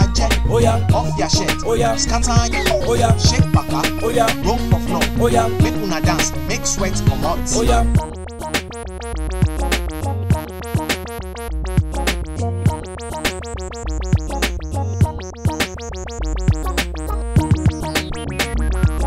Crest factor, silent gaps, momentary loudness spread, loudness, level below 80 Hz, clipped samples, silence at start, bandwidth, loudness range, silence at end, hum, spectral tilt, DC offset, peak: 18 dB; none; 10 LU; -19 LUFS; -24 dBFS; under 0.1%; 0 s; 16 kHz; 6 LU; 0 s; none; -5 dB/octave; under 0.1%; 0 dBFS